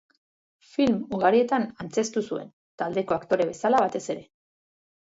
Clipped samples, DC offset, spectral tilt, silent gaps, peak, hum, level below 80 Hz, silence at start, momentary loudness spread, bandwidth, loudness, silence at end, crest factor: under 0.1%; under 0.1%; -5 dB/octave; 2.53-2.78 s; -6 dBFS; none; -64 dBFS; 0.8 s; 12 LU; 8 kHz; -26 LUFS; 0.9 s; 20 dB